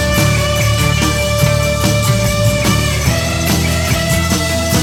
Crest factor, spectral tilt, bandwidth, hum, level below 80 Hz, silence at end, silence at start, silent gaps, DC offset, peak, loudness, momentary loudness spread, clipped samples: 12 dB; -4.5 dB/octave; 19 kHz; none; -24 dBFS; 0 s; 0 s; none; under 0.1%; 0 dBFS; -13 LUFS; 2 LU; under 0.1%